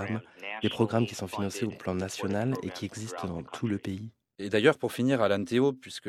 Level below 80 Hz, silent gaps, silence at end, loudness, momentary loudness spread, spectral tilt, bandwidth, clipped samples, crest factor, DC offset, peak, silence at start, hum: -68 dBFS; none; 0 s; -30 LUFS; 12 LU; -5.5 dB/octave; 16 kHz; under 0.1%; 22 dB; under 0.1%; -8 dBFS; 0 s; none